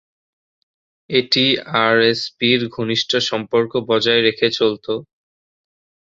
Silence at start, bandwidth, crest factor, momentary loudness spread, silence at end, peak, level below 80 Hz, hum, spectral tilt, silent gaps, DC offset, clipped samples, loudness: 1.1 s; 7.8 kHz; 18 dB; 6 LU; 1.1 s; -2 dBFS; -60 dBFS; none; -4.5 dB/octave; none; under 0.1%; under 0.1%; -17 LUFS